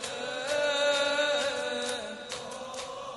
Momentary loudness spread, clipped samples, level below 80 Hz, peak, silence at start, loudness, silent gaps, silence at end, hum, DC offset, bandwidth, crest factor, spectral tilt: 12 LU; under 0.1%; -68 dBFS; -16 dBFS; 0 s; -30 LUFS; none; 0 s; none; under 0.1%; 11.5 kHz; 16 dB; -1 dB/octave